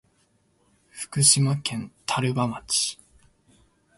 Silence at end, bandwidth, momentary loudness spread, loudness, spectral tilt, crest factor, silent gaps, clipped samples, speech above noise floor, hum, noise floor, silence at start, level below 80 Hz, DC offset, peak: 1.05 s; 12 kHz; 15 LU; -23 LUFS; -3 dB/octave; 24 dB; none; under 0.1%; 42 dB; none; -66 dBFS; 0.95 s; -60 dBFS; under 0.1%; -4 dBFS